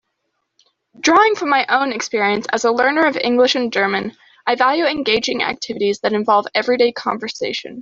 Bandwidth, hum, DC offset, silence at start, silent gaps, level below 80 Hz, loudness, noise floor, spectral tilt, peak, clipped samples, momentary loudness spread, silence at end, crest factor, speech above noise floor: 7.8 kHz; none; under 0.1%; 1 s; none; -60 dBFS; -17 LUFS; -72 dBFS; -3 dB/octave; 0 dBFS; under 0.1%; 8 LU; 0 s; 18 dB; 55 dB